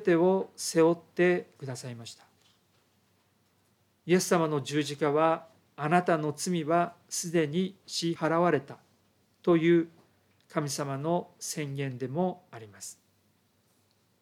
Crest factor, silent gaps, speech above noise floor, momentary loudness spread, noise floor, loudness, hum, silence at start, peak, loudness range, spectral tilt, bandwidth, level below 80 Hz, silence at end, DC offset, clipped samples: 20 dB; none; 41 dB; 16 LU; -69 dBFS; -29 LUFS; none; 0 s; -10 dBFS; 6 LU; -5 dB/octave; 16 kHz; -84 dBFS; 1.3 s; under 0.1%; under 0.1%